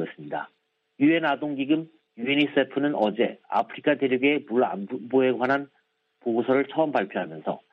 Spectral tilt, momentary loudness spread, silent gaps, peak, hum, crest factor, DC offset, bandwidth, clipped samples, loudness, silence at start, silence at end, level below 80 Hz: -8 dB/octave; 11 LU; none; -8 dBFS; none; 16 dB; under 0.1%; 5.4 kHz; under 0.1%; -25 LUFS; 0 s; 0.15 s; -74 dBFS